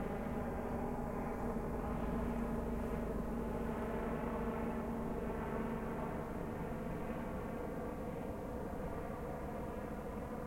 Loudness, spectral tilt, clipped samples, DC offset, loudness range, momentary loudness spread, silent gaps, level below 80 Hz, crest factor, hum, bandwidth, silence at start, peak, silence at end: -42 LUFS; -8 dB/octave; under 0.1%; under 0.1%; 3 LU; 4 LU; none; -48 dBFS; 16 dB; none; 16.5 kHz; 0 s; -26 dBFS; 0 s